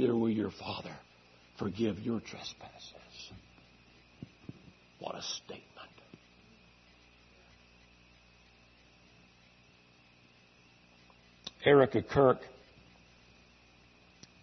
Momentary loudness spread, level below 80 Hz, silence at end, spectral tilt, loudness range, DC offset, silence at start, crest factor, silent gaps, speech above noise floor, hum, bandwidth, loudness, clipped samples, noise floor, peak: 27 LU; -66 dBFS; 1.9 s; -5 dB/octave; 15 LU; under 0.1%; 0 s; 26 dB; none; 31 dB; 60 Hz at -65 dBFS; 6.2 kHz; -32 LUFS; under 0.1%; -63 dBFS; -12 dBFS